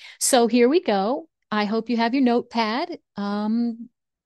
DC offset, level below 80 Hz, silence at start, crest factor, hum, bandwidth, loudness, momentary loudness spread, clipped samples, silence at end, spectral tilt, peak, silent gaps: under 0.1%; -70 dBFS; 0 s; 16 dB; none; 12.5 kHz; -22 LUFS; 11 LU; under 0.1%; 0.4 s; -3.5 dB/octave; -6 dBFS; none